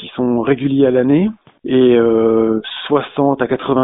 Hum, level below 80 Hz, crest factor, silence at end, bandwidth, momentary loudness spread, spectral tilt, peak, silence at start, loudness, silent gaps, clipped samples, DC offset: none; -50 dBFS; 14 dB; 0 s; 4 kHz; 6 LU; -6 dB/octave; 0 dBFS; 0 s; -15 LUFS; none; under 0.1%; under 0.1%